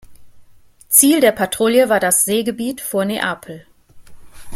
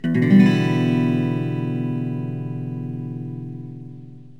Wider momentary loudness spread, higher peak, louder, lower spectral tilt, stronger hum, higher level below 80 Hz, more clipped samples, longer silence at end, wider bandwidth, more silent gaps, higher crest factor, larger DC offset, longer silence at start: second, 12 LU vs 21 LU; first, 0 dBFS vs -4 dBFS; first, -15 LUFS vs -21 LUFS; second, -2.5 dB/octave vs -8.5 dB/octave; neither; first, -52 dBFS vs -60 dBFS; neither; second, 0 s vs 0.15 s; first, 16.5 kHz vs 8 kHz; neither; about the same, 18 dB vs 18 dB; second, under 0.1% vs 0.5%; about the same, 0.1 s vs 0.05 s